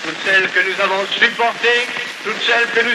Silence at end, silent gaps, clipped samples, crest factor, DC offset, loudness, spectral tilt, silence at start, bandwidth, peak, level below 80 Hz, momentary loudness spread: 0 s; none; under 0.1%; 16 dB; under 0.1%; -15 LUFS; -1.5 dB/octave; 0 s; 13.5 kHz; 0 dBFS; -70 dBFS; 7 LU